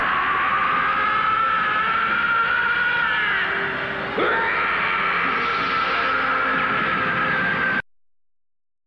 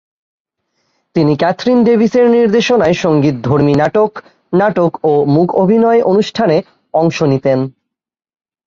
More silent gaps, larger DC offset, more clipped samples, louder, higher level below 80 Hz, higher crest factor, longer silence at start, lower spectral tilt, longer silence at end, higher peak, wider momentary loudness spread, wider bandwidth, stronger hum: neither; neither; neither; second, -20 LUFS vs -12 LUFS; about the same, -50 dBFS vs -50 dBFS; about the same, 10 dB vs 12 dB; second, 0 s vs 1.15 s; second, -5 dB/octave vs -7 dB/octave; about the same, 1.05 s vs 0.95 s; second, -10 dBFS vs 0 dBFS; second, 3 LU vs 6 LU; first, 8.2 kHz vs 7.4 kHz; neither